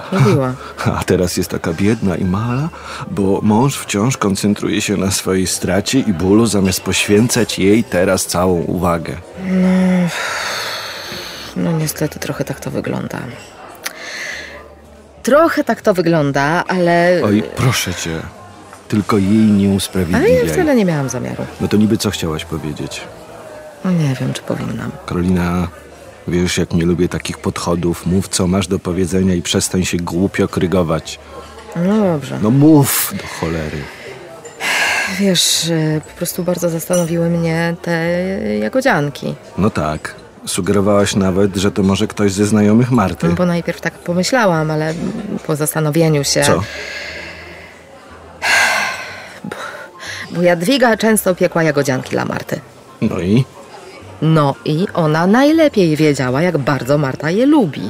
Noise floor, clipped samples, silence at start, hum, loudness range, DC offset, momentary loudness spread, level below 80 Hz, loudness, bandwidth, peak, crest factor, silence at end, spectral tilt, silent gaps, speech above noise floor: -40 dBFS; under 0.1%; 0 s; none; 5 LU; under 0.1%; 14 LU; -42 dBFS; -15 LUFS; 16 kHz; -2 dBFS; 14 dB; 0 s; -5 dB/octave; none; 25 dB